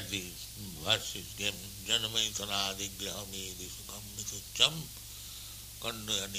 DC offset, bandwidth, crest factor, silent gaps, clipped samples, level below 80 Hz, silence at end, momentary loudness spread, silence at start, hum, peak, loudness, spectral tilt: under 0.1%; 15.5 kHz; 30 dB; none; under 0.1%; -56 dBFS; 0 s; 15 LU; 0 s; none; -8 dBFS; -34 LUFS; -1.5 dB/octave